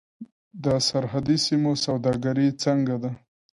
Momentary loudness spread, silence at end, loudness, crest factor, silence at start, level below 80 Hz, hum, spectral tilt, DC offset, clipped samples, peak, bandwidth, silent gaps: 9 LU; 0.4 s; -24 LUFS; 14 dB; 0.2 s; -56 dBFS; none; -5.5 dB/octave; under 0.1%; under 0.1%; -10 dBFS; 11.5 kHz; 0.32-0.51 s